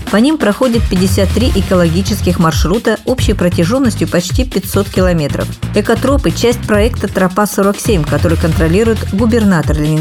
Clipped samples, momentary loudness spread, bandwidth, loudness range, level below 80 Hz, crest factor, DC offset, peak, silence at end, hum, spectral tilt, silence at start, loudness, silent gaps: under 0.1%; 4 LU; 17.5 kHz; 1 LU; -22 dBFS; 12 dB; under 0.1%; 0 dBFS; 0 s; none; -6 dB/octave; 0 s; -12 LUFS; none